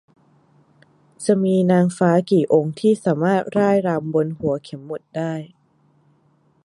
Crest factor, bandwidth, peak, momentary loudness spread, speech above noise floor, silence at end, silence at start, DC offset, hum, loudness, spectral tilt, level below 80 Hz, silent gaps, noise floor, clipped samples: 18 dB; 11.5 kHz; -2 dBFS; 11 LU; 41 dB; 1.2 s; 1.2 s; under 0.1%; none; -19 LUFS; -7.5 dB/octave; -62 dBFS; none; -60 dBFS; under 0.1%